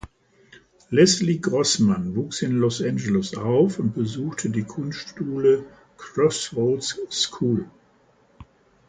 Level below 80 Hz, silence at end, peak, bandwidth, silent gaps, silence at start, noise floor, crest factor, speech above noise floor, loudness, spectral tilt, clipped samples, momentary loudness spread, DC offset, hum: -56 dBFS; 0.45 s; -4 dBFS; 9.6 kHz; none; 0.05 s; -59 dBFS; 20 dB; 37 dB; -23 LUFS; -5 dB/octave; under 0.1%; 11 LU; under 0.1%; none